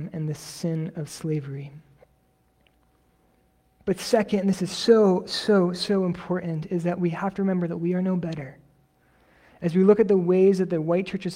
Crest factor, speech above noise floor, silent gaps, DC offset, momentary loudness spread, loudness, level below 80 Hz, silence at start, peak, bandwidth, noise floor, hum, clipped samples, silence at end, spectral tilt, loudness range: 20 dB; 41 dB; none; under 0.1%; 14 LU; -24 LUFS; -62 dBFS; 0 s; -6 dBFS; 15 kHz; -65 dBFS; none; under 0.1%; 0 s; -6.5 dB/octave; 11 LU